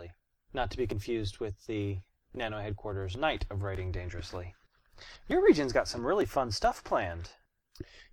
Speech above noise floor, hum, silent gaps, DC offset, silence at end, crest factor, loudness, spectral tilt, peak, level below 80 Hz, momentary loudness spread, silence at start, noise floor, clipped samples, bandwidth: 22 dB; none; none; under 0.1%; 0.1 s; 22 dB; -32 LUFS; -6 dB/octave; -10 dBFS; -48 dBFS; 22 LU; 0 s; -54 dBFS; under 0.1%; 19 kHz